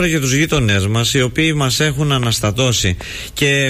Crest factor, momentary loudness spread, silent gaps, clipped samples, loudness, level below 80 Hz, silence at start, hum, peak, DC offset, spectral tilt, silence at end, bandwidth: 10 dB; 3 LU; none; under 0.1%; -15 LUFS; -34 dBFS; 0 s; none; -4 dBFS; under 0.1%; -4 dB/octave; 0 s; 15.5 kHz